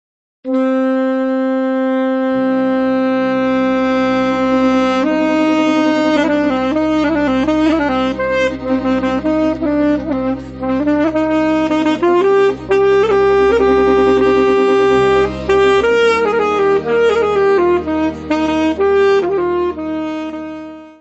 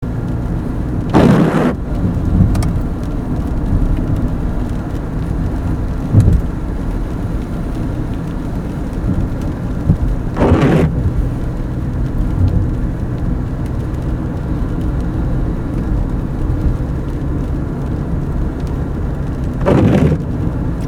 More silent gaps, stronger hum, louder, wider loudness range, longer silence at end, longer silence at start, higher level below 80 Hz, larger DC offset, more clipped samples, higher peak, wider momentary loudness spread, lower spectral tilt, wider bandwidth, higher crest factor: neither; neither; first, -14 LUFS vs -17 LUFS; about the same, 4 LU vs 5 LU; about the same, 0.1 s vs 0 s; first, 0.45 s vs 0 s; second, -40 dBFS vs -20 dBFS; neither; neither; about the same, 0 dBFS vs 0 dBFS; second, 6 LU vs 9 LU; second, -6 dB/octave vs -8.5 dB/octave; second, 8.2 kHz vs 13.5 kHz; about the same, 12 dB vs 16 dB